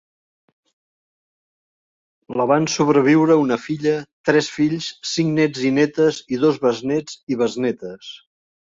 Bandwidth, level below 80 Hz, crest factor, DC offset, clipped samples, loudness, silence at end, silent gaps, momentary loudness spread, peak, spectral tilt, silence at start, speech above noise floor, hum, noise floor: 7.8 kHz; -62 dBFS; 18 dB; under 0.1%; under 0.1%; -19 LUFS; 0.45 s; 4.13-4.24 s, 7.23-7.27 s; 11 LU; -2 dBFS; -5.5 dB/octave; 2.3 s; over 71 dB; none; under -90 dBFS